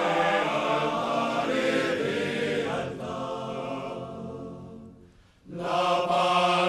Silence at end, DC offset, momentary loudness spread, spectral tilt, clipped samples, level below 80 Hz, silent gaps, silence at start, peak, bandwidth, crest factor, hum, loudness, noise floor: 0 s; under 0.1%; 15 LU; -4.5 dB/octave; under 0.1%; -60 dBFS; none; 0 s; -10 dBFS; 14 kHz; 16 dB; none; -27 LUFS; -55 dBFS